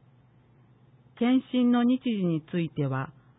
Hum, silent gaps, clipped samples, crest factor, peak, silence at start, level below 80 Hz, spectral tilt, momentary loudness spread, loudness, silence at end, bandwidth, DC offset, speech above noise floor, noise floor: none; none; under 0.1%; 14 dB; -14 dBFS; 1.15 s; -68 dBFS; -11.5 dB/octave; 8 LU; -27 LUFS; 0.3 s; 4 kHz; under 0.1%; 34 dB; -59 dBFS